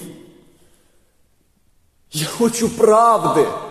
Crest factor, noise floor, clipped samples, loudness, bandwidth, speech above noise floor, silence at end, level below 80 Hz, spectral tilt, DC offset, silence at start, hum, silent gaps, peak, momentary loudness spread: 18 dB; -59 dBFS; under 0.1%; -16 LUFS; 14.5 kHz; 43 dB; 0 s; -56 dBFS; -4.5 dB/octave; under 0.1%; 0 s; none; none; -2 dBFS; 14 LU